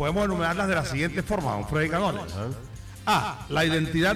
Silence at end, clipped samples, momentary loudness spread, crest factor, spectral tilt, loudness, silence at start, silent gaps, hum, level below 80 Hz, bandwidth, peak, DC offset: 0 s; under 0.1%; 10 LU; 14 dB; -5.5 dB/octave; -26 LUFS; 0 s; none; none; -42 dBFS; 16 kHz; -12 dBFS; under 0.1%